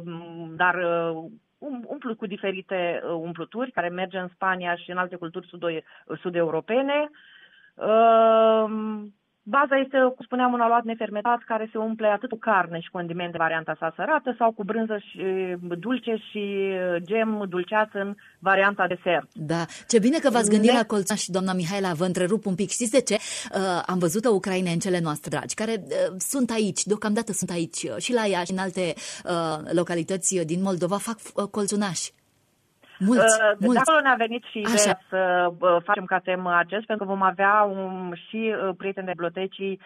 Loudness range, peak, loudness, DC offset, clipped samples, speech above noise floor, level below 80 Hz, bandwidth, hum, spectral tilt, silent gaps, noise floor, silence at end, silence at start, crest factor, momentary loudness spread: 6 LU; -6 dBFS; -24 LUFS; under 0.1%; under 0.1%; 42 dB; -70 dBFS; 14 kHz; none; -4 dB/octave; none; -66 dBFS; 0.1 s; 0 s; 18 dB; 11 LU